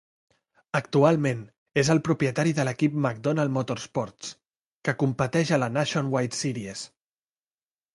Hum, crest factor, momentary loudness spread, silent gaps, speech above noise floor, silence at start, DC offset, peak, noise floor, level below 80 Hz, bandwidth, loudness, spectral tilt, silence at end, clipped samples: none; 22 dB; 13 LU; 1.58-1.66 s, 4.66-4.80 s; over 65 dB; 0.75 s; under 0.1%; -6 dBFS; under -90 dBFS; -62 dBFS; 11.5 kHz; -26 LUFS; -5.5 dB/octave; 1.1 s; under 0.1%